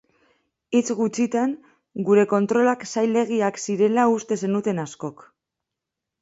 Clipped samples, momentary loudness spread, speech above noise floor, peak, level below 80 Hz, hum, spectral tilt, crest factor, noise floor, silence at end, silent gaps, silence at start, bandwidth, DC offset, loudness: under 0.1%; 12 LU; 63 dB; -6 dBFS; -70 dBFS; none; -5.5 dB/octave; 16 dB; -85 dBFS; 1.1 s; none; 0.7 s; 8 kHz; under 0.1%; -22 LUFS